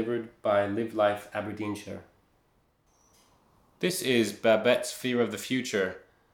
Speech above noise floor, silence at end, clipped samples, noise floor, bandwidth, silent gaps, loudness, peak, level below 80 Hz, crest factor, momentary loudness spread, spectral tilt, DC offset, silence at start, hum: 40 dB; 0.35 s; under 0.1%; -68 dBFS; 19.5 kHz; none; -28 LUFS; -8 dBFS; -72 dBFS; 22 dB; 11 LU; -4 dB/octave; under 0.1%; 0 s; none